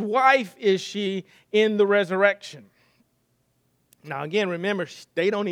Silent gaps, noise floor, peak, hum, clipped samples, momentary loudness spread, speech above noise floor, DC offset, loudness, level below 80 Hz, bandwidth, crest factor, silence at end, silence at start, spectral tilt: none; -69 dBFS; -4 dBFS; none; under 0.1%; 14 LU; 46 dB; under 0.1%; -23 LUFS; -80 dBFS; 12 kHz; 20 dB; 0 s; 0 s; -5 dB/octave